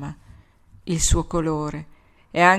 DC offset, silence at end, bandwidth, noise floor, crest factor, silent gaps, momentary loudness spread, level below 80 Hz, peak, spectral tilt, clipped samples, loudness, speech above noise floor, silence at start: under 0.1%; 0 s; 16 kHz; -51 dBFS; 22 dB; none; 18 LU; -32 dBFS; 0 dBFS; -4 dB/octave; under 0.1%; -23 LUFS; 31 dB; 0 s